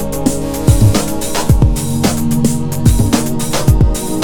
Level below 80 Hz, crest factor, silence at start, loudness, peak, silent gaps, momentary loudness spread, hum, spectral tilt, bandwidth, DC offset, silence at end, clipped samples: -18 dBFS; 12 dB; 0 s; -14 LUFS; 0 dBFS; none; 5 LU; none; -5.5 dB/octave; over 20 kHz; under 0.1%; 0 s; 0.2%